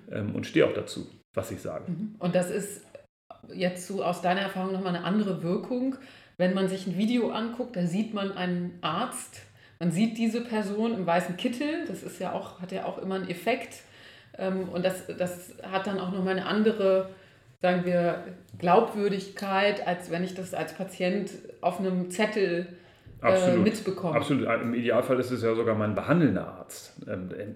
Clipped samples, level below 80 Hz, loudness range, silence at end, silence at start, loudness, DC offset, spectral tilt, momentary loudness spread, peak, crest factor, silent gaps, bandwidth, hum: under 0.1%; -68 dBFS; 6 LU; 0 s; 0.05 s; -28 LUFS; under 0.1%; -6 dB/octave; 12 LU; -8 dBFS; 20 dB; 1.25-1.34 s, 3.09-3.30 s; 15.5 kHz; none